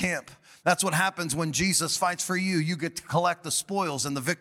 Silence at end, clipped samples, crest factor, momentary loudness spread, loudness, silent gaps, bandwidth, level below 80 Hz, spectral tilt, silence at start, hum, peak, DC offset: 0.05 s; under 0.1%; 20 dB; 6 LU; -26 LUFS; none; 17.5 kHz; -58 dBFS; -3.5 dB/octave; 0 s; none; -8 dBFS; under 0.1%